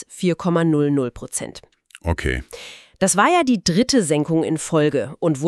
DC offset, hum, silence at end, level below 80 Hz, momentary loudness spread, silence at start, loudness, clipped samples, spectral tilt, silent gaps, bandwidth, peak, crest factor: under 0.1%; none; 0 s; -40 dBFS; 13 LU; 0 s; -19 LUFS; under 0.1%; -5 dB/octave; none; 13.5 kHz; -4 dBFS; 16 dB